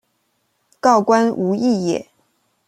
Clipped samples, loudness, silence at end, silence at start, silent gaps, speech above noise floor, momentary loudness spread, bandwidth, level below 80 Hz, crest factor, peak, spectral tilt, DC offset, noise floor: under 0.1%; -17 LUFS; 0.65 s; 0.85 s; none; 52 dB; 8 LU; 11.5 kHz; -66 dBFS; 18 dB; -2 dBFS; -6 dB/octave; under 0.1%; -67 dBFS